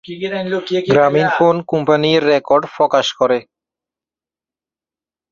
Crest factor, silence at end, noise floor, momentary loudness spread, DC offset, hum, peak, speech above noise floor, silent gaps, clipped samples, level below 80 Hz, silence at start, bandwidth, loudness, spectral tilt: 16 dB; 1.9 s; under -90 dBFS; 8 LU; under 0.1%; none; -2 dBFS; over 75 dB; none; under 0.1%; -58 dBFS; 0.1 s; 7.4 kHz; -15 LUFS; -5.5 dB/octave